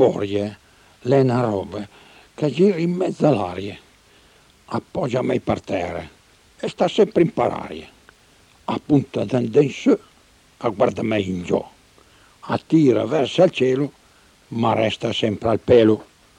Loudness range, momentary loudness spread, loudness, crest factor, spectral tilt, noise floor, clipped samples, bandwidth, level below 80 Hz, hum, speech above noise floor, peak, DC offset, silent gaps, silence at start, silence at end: 4 LU; 15 LU; -20 LUFS; 18 dB; -7 dB/octave; -54 dBFS; under 0.1%; 11 kHz; -54 dBFS; none; 35 dB; -4 dBFS; under 0.1%; none; 0 s; 0.35 s